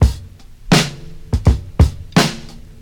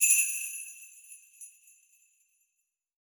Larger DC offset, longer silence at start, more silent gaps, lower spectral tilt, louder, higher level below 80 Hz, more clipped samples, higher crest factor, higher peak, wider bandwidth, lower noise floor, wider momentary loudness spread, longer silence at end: neither; about the same, 0 s vs 0 s; neither; first, -5 dB/octave vs 12 dB/octave; first, -17 LUFS vs -27 LUFS; first, -22 dBFS vs under -90 dBFS; neither; second, 16 dB vs 24 dB; first, -2 dBFS vs -8 dBFS; second, 18 kHz vs over 20 kHz; second, -36 dBFS vs -82 dBFS; second, 17 LU vs 26 LU; second, 0.25 s vs 1.55 s